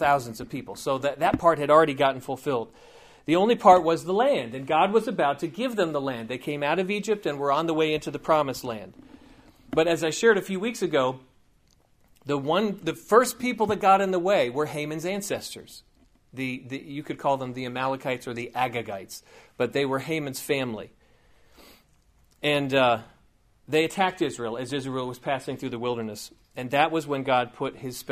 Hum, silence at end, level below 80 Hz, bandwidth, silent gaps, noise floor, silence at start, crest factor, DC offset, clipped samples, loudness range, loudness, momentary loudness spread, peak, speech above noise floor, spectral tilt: none; 0 s; -60 dBFS; 15.5 kHz; none; -62 dBFS; 0 s; 24 dB; under 0.1%; under 0.1%; 8 LU; -25 LUFS; 15 LU; -2 dBFS; 37 dB; -5 dB/octave